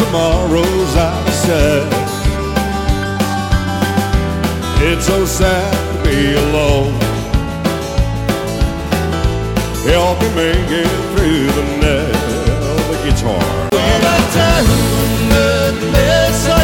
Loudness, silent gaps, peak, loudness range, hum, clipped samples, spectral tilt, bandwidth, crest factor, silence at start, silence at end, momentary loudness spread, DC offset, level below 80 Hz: -14 LUFS; none; 0 dBFS; 3 LU; none; under 0.1%; -5 dB/octave; 16.5 kHz; 14 dB; 0 s; 0 s; 6 LU; under 0.1%; -20 dBFS